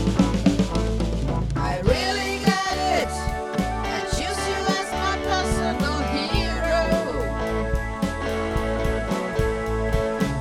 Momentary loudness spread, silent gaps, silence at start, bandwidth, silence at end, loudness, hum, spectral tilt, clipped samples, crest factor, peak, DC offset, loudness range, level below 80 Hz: 5 LU; none; 0 s; 15 kHz; 0 s; -24 LUFS; none; -5 dB/octave; under 0.1%; 18 dB; -6 dBFS; under 0.1%; 2 LU; -30 dBFS